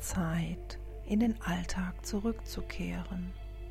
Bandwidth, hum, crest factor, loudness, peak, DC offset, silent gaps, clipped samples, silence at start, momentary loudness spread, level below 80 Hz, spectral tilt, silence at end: 15.5 kHz; none; 16 dB; -36 LUFS; -18 dBFS; under 0.1%; none; under 0.1%; 0 s; 12 LU; -42 dBFS; -5.5 dB/octave; 0 s